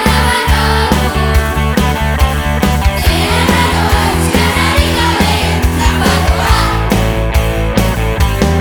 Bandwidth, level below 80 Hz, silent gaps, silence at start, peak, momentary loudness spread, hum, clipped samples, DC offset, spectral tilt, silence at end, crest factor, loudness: over 20 kHz; -16 dBFS; none; 0 s; 0 dBFS; 3 LU; none; under 0.1%; under 0.1%; -5 dB/octave; 0 s; 10 dB; -12 LUFS